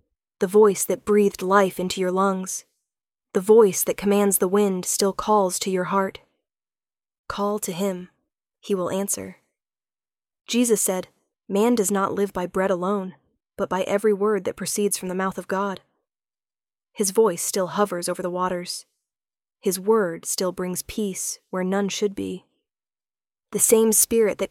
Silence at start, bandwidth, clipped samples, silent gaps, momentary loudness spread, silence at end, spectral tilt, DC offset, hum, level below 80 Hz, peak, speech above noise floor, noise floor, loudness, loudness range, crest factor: 0.4 s; 17 kHz; under 0.1%; 7.19-7.24 s; 11 LU; 0.05 s; -4 dB/octave; under 0.1%; none; -58 dBFS; -4 dBFS; over 68 dB; under -90 dBFS; -22 LUFS; 8 LU; 20 dB